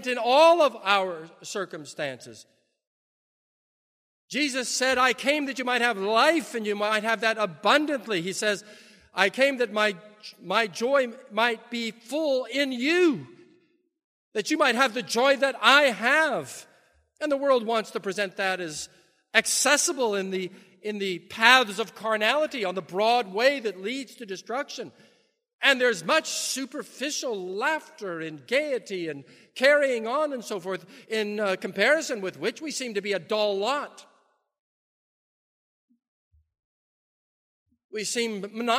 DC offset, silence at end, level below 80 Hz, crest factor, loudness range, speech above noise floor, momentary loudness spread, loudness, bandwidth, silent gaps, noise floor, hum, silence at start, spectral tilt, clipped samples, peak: under 0.1%; 0 s; -76 dBFS; 26 dB; 8 LU; 41 dB; 14 LU; -25 LUFS; 15.5 kHz; 2.87-4.28 s, 14.04-14.32 s, 25.53-25.59 s, 34.59-35.88 s, 36.08-36.31 s, 36.64-37.66 s, 37.84-37.89 s; -66 dBFS; none; 0 s; -2 dB/octave; under 0.1%; 0 dBFS